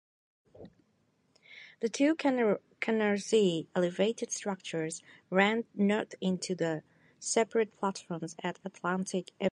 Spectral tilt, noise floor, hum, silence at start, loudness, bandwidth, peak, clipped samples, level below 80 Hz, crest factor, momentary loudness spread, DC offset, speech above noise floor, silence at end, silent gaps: -4.5 dB/octave; -72 dBFS; none; 0.6 s; -31 LUFS; 11.5 kHz; -10 dBFS; under 0.1%; -78 dBFS; 22 dB; 11 LU; under 0.1%; 41 dB; 0.05 s; none